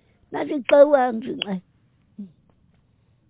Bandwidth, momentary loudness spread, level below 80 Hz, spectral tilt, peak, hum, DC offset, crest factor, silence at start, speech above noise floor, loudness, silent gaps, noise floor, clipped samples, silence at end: 4 kHz; 27 LU; -66 dBFS; -9 dB/octave; -2 dBFS; none; under 0.1%; 20 dB; 0.3 s; 42 dB; -20 LUFS; none; -61 dBFS; under 0.1%; 1.05 s